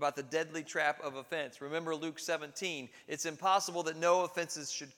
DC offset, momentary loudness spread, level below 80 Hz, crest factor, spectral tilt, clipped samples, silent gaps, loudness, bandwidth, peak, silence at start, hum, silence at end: under 0.1%; 9 LU; -90 dBFS; 20 dB; -2.5 dB/octave; under 0.1%; none; -35 LUFS; 18 kHz; -16 dBFS; 0 s; none; 0.05 s